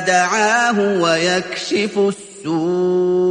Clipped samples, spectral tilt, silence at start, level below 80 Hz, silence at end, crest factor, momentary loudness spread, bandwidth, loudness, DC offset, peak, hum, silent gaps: under 0.1%; -4 dB/octave; 0 s; -60 dBFS; 0 s; 14 dB; 6 LU; 10.5 kHz; -17 LUFS; under 0.1%; -2 dBFS; none; none